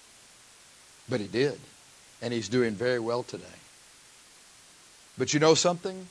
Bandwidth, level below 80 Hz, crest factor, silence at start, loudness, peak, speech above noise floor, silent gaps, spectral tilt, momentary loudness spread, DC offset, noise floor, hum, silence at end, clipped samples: 11 kHz; -70 dBFS; 24 dB; 1.1 s; -27 LUFS; -8 dBFS; 27 dB; none; -4 dB/octave; 24 LU; under 0.1%; -55 dBFS; none; 0 s; under 0.1%